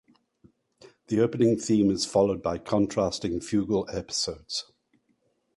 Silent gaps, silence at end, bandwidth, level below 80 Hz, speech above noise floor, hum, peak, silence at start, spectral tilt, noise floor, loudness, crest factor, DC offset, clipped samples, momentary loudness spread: none; 0.95 s; 11.5 kHz; -54 dBFS; 46 dB; none; -10 dBFS; 1.1 s; -5 dB/octave; -71 dBFS; -26 LUFS; 18 dB; under 0.1%; under 0.1%; 8 LU